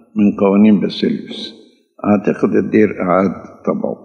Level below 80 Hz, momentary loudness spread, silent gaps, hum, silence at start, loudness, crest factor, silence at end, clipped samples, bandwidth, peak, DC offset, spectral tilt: -60 dBFS; 12 LU; none; none; 0.15 s; -15 LUFS; 14 dB; 0.1 s; under 0.1%; 6.4 kHz; 0 dBFS; under 0.1%; -8.5 dB/octave